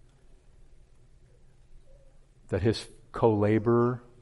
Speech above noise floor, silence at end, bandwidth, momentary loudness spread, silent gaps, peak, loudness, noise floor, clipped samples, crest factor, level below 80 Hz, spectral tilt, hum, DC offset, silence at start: 31 dB; 0.2 s; 11.5 kHz; 11 LU; none; -8 dBFS; -27 LUFS; -56 dBFS; under 0.1%; 22 dB; -54 dBFS; -8 dB/octave; none; under 0.1%; 1.75 s